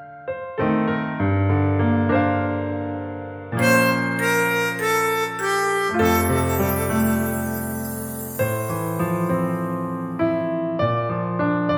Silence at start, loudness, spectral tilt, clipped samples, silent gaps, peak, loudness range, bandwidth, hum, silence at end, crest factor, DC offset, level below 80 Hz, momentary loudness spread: 0 s; -22 LUFS; -6 dB/octave; under 0.1%; none; -4 dBFS; 4 LU; over 20 kHz; none; 0 s; 16 dB; under 0.1%; -46 dBFS; 9 LU